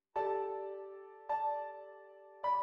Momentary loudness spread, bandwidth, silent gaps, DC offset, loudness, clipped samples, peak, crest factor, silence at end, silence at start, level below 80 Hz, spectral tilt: 17 LU; 6.2 kHz; none; under 0.1%; -39 LUFS; under 0.1%; -26 dBFS; 14 dB; 0 s; 0.15 s; -80 dBFS; -6 dB/octave